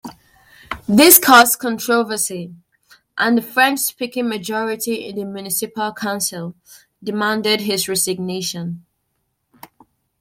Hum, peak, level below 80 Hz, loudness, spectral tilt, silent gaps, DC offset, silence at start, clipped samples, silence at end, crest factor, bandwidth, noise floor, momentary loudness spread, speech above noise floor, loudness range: none; 0 dBFS; -58 dBFS; -16 LUFS; -2.5 dB/octave; none; under 0.1%; 0.05 s; under 0.1%; 1.4 s; 18 dB; 16.5 kHz; -71 dBFS; 21 LU; 54 dB; 9 LU